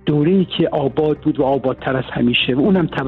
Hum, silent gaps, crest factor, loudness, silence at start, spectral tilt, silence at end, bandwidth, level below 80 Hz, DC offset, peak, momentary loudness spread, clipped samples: none; none; 12 dB; -17 LUFS; 0.05 s; -9 dB/octave; 0 s; 4.5 kHz; -44 dBFS; under 0.1%; -4 dBFS; 5 LU; under 0.1%